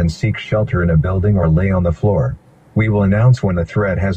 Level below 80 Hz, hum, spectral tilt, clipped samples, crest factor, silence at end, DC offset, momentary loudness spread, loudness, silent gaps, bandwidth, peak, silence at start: -30 dBFS; none; -8.5 dB/octave; under 0.1%; 12 dB; 0 s; under 0.1%; 6 LU; -16 LUFS; none; 8.4 kHz; -2 dBFS; 0 s